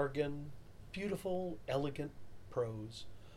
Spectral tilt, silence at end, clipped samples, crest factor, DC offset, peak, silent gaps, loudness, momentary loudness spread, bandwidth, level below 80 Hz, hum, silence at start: -6.5 dB/octave; 0 s; under 0.1%; 18 dB; under 0.1%; -24 dBFS; none; -41 LUFS; 14 LU; 16 kHz; -60 dBFS; none; 0 s